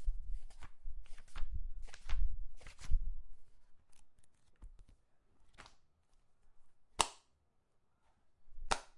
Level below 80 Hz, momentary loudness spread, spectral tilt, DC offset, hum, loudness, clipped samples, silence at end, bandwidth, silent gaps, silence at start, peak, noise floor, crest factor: -44 dBFS; 24 LU; -2 dB/octave; under 0.1%; none; -44 LUFS; under 0.1%; 0.15 s; 11.5 kHz; none; 0 s; -8 dBFS; -74 dBFS; 30 dB